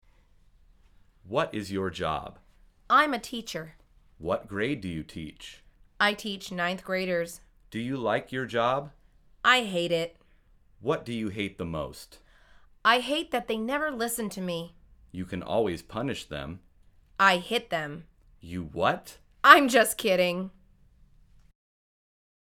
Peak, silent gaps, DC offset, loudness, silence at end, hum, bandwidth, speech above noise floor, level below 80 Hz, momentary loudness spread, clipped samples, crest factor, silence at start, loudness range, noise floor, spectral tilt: 0 dBFS; none; under 0.1%; -27 LUFS; 2.05 s; none; 19.5 kHz; 33 dB; -56 dBFS; 18 LU; under 0.1%; 30 dB; 1.25 s; 8 LU; -60 dBFS; -4 dB/octave